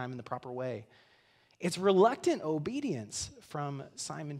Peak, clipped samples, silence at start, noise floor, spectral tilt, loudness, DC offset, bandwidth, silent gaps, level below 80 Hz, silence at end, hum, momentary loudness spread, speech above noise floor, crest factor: -12 dBFS; under 0.1%; 0 s; -66 dBFS; -5 dB/octave; -33 LUFS; under 0.1%; 14.5 kHz; none; -68 dBFS; 0 s; none; 15 LU; 34 dB; 20 dB